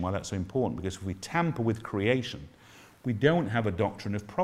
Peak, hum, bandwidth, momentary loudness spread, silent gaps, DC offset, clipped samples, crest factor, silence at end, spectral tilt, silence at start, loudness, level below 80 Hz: -8 dBFS; none; 14 kHz; 12 LU; none; under 0.1%; under 0.1%; 22 dB; 0 s; -6.5 dB/octave; 0 s; -30 LUFS; -58 dBFS